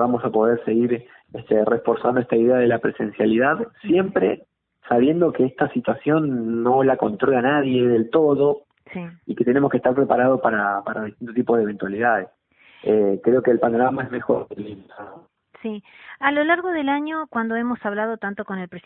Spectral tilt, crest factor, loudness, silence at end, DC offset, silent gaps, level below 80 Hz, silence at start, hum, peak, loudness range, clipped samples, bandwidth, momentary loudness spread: -11.5 dB/octave; 18 dB; -20 LUFS; 0.05 s; under 0.1%; none; -60 dBFS; 0 s; none; -4 dBFS; 4 LU; under 0.1%; 4 kHz; 14 LU